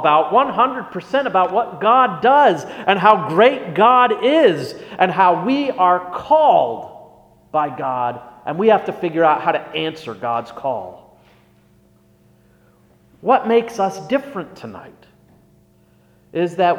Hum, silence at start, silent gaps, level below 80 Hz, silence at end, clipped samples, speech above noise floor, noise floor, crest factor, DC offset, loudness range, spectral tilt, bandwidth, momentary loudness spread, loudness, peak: none; 0 s; none; -62 dBFS; 0 s; under 0.1%; 38 dB; -54 dBFS; 18 dB; under 0.1%; 10 LU; -6 dB/octave; 13 kHz; 15 LU; -17 LUFS; 0 dBFS